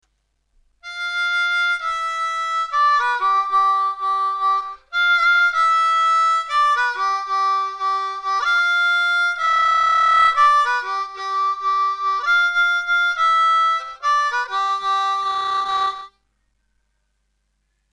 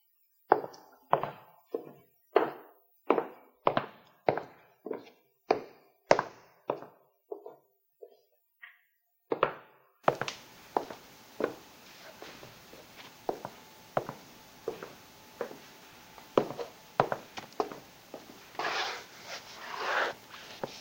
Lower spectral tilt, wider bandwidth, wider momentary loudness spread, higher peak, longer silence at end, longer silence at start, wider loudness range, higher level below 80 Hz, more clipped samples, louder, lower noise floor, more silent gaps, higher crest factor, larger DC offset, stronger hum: second, 1.5 dB/octave vs -4.5 dB/octave; second, 10.5 kHz vs 16 kHz; second, 8 LU vs 22 LU; about the same, -4 dBFS vs -4 dBFS; first, 1.85 s vs 0 s; first, 0.85 s vs 0.5 s; second, 4 LU vs 8 LU; first, -60 dBFS vs -74 dBFS; neither; first, -18 LUFS vs -34 LUFS; second, -69 dBFS vs -75 dBFS; neither; second, 14 dB vs 32 dB; neither; neither